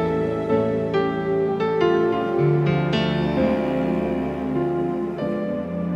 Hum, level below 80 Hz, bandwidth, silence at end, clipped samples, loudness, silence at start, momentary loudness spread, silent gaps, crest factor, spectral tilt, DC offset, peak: none; -46 dBFS; 8 kHz; 0 s; under 0.1%; -22 LUFS; 0 s; 6 LU; none; 14 dB; -8.5 dB/octave; under 0.1%; -8 dBFS